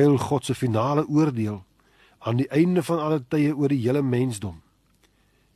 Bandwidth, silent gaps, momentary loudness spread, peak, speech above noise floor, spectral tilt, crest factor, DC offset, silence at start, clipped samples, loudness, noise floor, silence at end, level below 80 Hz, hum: 13 kHz; none; 9 LU; -8 dBFS; 41 dB; -7.5 dB/octave; 16 dB; under 0.1%; 0 s; under 0.1%; -24 LUFS; -63 dBFS; 1 s; -58 dBFS; none